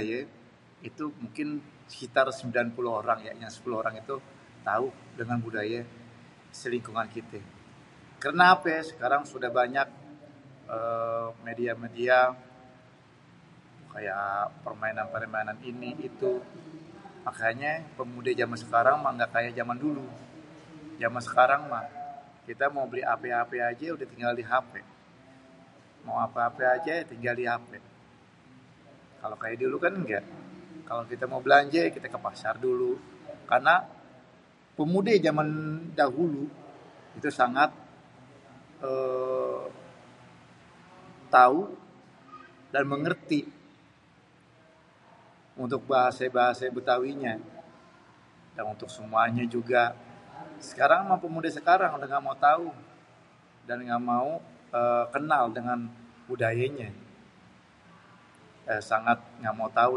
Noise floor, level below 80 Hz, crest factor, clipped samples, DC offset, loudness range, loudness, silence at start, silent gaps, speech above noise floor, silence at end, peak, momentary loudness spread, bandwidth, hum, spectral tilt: -59 dBFS; -72 dBFS; 24 dB; under 0.1%; under 0.1%; 7 LU; -28 LUFS; 0 s; none; 32 dB; 0 s; -4 dBFS; 21 LU; 11 kHz; none; -6 dB/octave